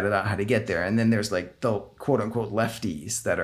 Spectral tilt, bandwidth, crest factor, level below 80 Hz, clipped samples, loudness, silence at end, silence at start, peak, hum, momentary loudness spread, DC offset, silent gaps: -5.5 dB/octave; 15.5 kHz; 16 dB; -54 dBFS; under 0.1%; -26 LUFS; 0 s; 0 s; -10 dBFS; none; 6 LU; under 0.1%; none